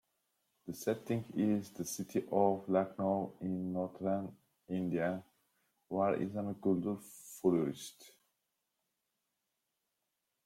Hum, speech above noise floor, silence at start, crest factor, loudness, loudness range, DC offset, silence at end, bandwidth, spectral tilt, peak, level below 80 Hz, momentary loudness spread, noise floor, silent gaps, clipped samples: none; 51 dB; 0.65 s; 22 dB; -36 LUFS; 4 LU; under 0.1%; 2.35 s; 16.5 kHz; -6.5 dB/octave; -16 dBFS; -76 dBFS; 12 LU; -86 dBFS; none; under 0.1%